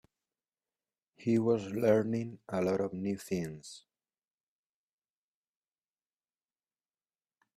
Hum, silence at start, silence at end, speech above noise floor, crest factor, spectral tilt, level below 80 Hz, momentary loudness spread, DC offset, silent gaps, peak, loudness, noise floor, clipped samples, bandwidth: none; 1.2 s; 3.8 s; over 58 dB; 22 dB; -7 dB/octave; -72 dBFS; 12 LU; under 0.1%; none; -14 dBFS; -32 LUFS; under -90 dBFS; under 0.1%; 14.5 kHz